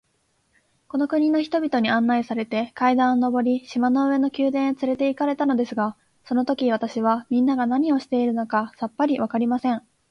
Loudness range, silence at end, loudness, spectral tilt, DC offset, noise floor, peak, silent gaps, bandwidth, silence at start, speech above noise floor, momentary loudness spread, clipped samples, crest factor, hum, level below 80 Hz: 2 LU; 0.3 s; -22 LUFS; -6.5 dB/octave; under 0.1%; -68 dBFS; -8 dBFS; none; 6.6 kHz; 0.95 s; 47 dB; 6 LU; under 0.1%; 14 dB; none; -66 dBFS